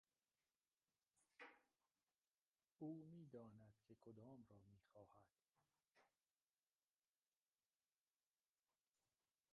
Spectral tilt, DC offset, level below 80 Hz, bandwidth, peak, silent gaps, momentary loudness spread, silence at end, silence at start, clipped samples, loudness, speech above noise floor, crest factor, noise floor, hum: -7 dB/octave; under 0.1%; under -90 dBFS; 4.3 kHz; -44 dBFS; 2.27-2.31 s, 2.47-2.51 s; 10 LU; 3.45 s; 1.15 s; under 0.1%; -62 LUFS; over 28 dB; 24 dB; under -90 dBFS; none